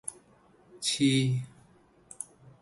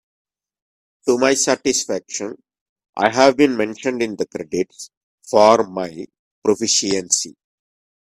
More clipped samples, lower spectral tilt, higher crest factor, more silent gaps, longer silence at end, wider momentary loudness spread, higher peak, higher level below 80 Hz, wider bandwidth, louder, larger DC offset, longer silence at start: neither; first, -4.5 dB/octave vs -2.5 dB/octave; about the same, 18 dB vs 20 dB; second, none vs 2.61-2.76 s, 2.89-2.93 s, 4.97-5.18 s, 6.19-6.42 s; second, 0.4 s vs 0.85 s; about the same, 18 LU vs 17 LU; second, -14 dBFS vs 0 dBFS; second, -68 dBFS vs -62 dBFS; second, 11.5 kHz vs 14.5 kHz; second, -28 LUFS vs -18 LUFS; neither; second, 0.05 s vs 1.05 s